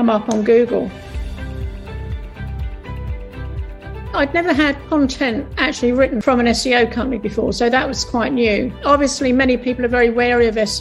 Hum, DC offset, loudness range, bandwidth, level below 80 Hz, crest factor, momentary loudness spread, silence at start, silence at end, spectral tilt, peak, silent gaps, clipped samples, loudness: none; under 0.1%; 9 LU; 12.5 kHz; -32 dBFS; 16 dB; 15 LU; 0 s; 0 s; -5 dB/octave; -2 dBFS; none; under 0.1%; -17 LUFS